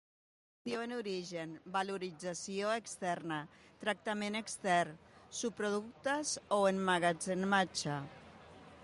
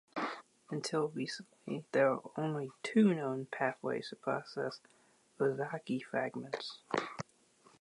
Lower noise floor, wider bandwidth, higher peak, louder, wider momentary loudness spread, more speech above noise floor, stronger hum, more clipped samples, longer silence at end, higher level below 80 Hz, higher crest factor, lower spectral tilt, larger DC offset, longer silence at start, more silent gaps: second, -56 dBFS vs -67 dBFS; about the same, 11.5 kHz vs 11.5 kHz; about the same, -18 dBFS vs -18 dBFS; about the same, -37 LUFS vs -36 LUFS; about the same, 14 LU vs 13 LU; second, 20 dB vs 31 dB; neither; neither; second, 0 s vs 0.6 s; first, -74 dBFS vs -82 dBFS; about the same, 18 dB vs 20 dB; second, -4 dB/octave vs -6 dB/octave; neither; first, 0.65 s vs 0.15 s; neither